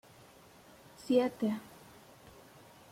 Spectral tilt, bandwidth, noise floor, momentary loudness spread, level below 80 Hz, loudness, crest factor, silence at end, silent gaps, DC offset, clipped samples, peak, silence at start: -6 dB/octave; 16.5 kHz; -58 dBFS; 27 LU; -74 dBFS; -33 LUFS; 22 dB; 1.3 s; none; under 0.1%; under 0.1%; -16 dBFS; 1 s